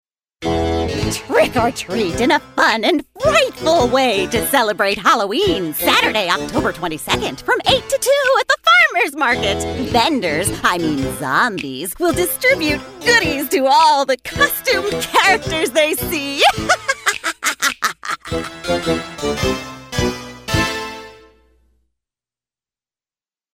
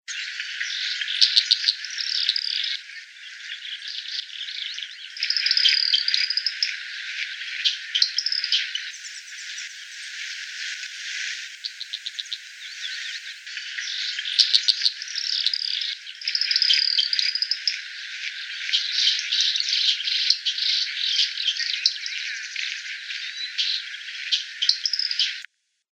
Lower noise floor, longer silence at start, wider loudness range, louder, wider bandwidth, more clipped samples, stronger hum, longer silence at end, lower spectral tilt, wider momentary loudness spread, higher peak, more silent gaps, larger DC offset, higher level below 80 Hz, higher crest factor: first, under -90 dBFS vs -48 dBFS; first, 0.4 s vs 0.1 s; second, 7 LU vs 10 LU; first, -16 LUFS vs -22 LUFS; about the same, 16.5 kHz vs 16.5 kHz; neither; neither; first, 2.4 s vs 0.5 s; first, -3 dB/octave vs 13.5 dB/octave; second, 8 LU vs 15 LU; about the same, 0 dBFS vs -2 dBFS; neither; neither; first, -38 dBFS vs under -90 dBFS; second, 16 dB vs 24 dB